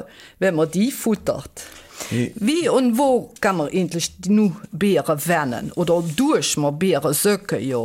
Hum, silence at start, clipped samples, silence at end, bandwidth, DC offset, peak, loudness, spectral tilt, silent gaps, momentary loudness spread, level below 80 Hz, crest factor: none; 0 s; under 0.1%; 0 s; 17 kHz; under 0.1%; -6 dBFS; -20 LUFS; -5 dB/octave; none; 8 LU; -54 dBFS; 14 dB